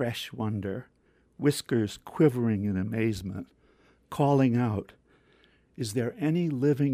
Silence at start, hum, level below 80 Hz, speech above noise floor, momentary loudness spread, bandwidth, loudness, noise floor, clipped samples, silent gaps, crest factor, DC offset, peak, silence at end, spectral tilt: 0 s; none; -62 dBFS; 36 dB; 14 LU; 15.5 kHz; -28 LUFS; -63 dBFS; under 0.1%; none; 18 dB; under 0.1%; -10 dBFS; 0 s; -7 dB/octave